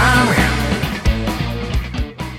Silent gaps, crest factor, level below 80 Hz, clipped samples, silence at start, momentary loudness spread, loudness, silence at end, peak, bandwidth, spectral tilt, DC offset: none; 16 dB; -24 dBFS; under 0.1%; 0 s; 10 LU; -18 LUFS; 0 s; 0 dBFS; 16.5 kHz; -5 dB/octave; under 0.1%